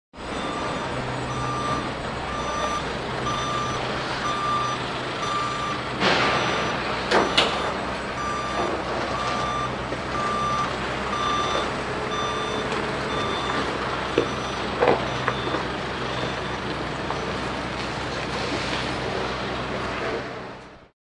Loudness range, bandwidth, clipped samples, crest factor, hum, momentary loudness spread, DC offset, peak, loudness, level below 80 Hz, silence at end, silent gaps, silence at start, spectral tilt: 5 LU; 11.5 kHz; under 0.1%; 24 dB; none; 7 LU; under 0.1%; -2 dBFS; -25 LUFS; -44 dBFS; 0.2 s; none; 0.15 s; -4 dB/octave